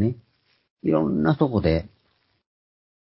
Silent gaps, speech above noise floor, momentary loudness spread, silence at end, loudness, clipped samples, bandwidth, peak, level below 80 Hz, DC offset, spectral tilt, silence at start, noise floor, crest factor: 0.70-0.77 s; 47 dB; 8 LU; 1.2 s; -23 LUFS; under 0.1%; 5.8 kHz; -6 dBFS; -42 dBFS; under 0.1%; -12.5 dB/octave; 0 s; -68 dBFS; 20 dB